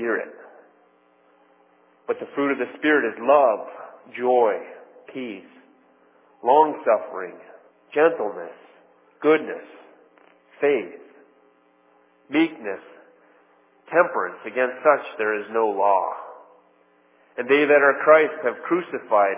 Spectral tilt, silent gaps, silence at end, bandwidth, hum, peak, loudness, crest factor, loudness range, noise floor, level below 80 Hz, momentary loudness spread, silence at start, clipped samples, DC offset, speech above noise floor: -8.5 dB/octave; none; 0 s; 3.8 kHz; none; -2 dBFS; -21 LUFS; 20 dB; 7 LU; -59 dBFS; -86 dBFS; 20 LU; 0 s; under 0.1%; under 0.1%; 38 dB